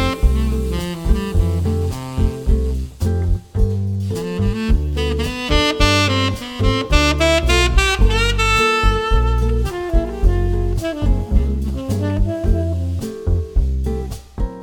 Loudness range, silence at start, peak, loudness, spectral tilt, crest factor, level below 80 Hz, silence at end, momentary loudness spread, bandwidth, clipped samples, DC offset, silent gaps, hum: 5 LU; 0 s; 0 dBFS; -18 LUFS; -5.5 dB/octave; 16 dB; -20 dBFS; 0 s; 8 LU; 16.5 kHz; under 0.1%; under 0.1%; none; none